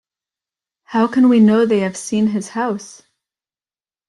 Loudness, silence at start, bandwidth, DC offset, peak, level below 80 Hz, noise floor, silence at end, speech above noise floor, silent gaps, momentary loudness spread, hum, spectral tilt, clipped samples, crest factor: -16 LUFS; 0.9 s; 11.5 kHz; under 0.1%; -4 dBFS; -60 dBFS; under -90 dBFS; 1.2 s; over 75 dB; none; 11 LU; none; -6 dB/octave; under 0.1%; 14 dB